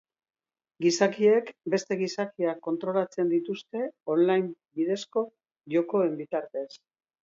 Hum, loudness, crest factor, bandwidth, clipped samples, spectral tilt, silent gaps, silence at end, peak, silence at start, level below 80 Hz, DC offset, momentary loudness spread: none; -28 LUFS; 20 dB; 7.8 kHz; under 0.1%; -5 dB/octave; none; 0.45 s; -8 dBFS; 0.8 s; -78 dBFS; under 0.1%; 11 LU